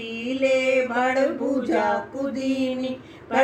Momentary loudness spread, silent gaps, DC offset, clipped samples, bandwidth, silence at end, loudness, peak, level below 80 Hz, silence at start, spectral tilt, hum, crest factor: 9 LU; none; under 0.1%; under 0.1%; 9 kHz; 0 s; -23 LUFS; -6 dBFS; -62 dBFS; 0 s; -4.5 dB/octave; none; 16 dB